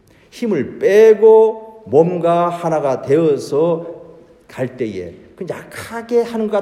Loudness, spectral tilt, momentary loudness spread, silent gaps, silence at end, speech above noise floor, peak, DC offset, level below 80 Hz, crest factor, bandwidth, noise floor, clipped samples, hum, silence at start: -15 LUFS; -7 dB/octave; 19 LU; none; 0 s; 28 dB; 0 dBFS; under 0.1%; -60 dBFS; 16 dB; 13 kHz; -42 dBFS; under 0.1%; none; 0.35 s